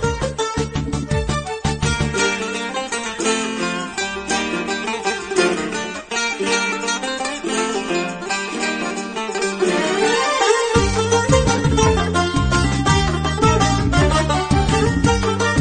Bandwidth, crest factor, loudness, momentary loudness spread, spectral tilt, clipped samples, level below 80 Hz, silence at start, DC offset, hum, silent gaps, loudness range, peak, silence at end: 9.6 kHz; 18 dB; -19 LUFS; 7 LU; -4.5 dB/octave; under 0.1%; -30 dBFS; 0 s; under 0.1%; none; none; 5 LU; -2 dBFS; 0 s